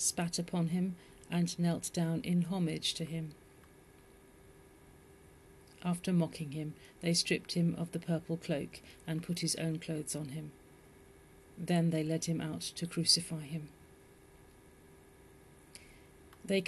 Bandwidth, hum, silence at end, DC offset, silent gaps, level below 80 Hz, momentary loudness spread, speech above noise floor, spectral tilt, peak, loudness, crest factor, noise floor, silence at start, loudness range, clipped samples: 12.5 kHz; none; 0 s; under 0.1%; none; -66 dBFS; 15 LU; 25 dB; -4.5 dB/octave; -14 dBFS; -35 LUFS; 24 dB; -60 dBFS; 0 s; 6 LU; under 0.1%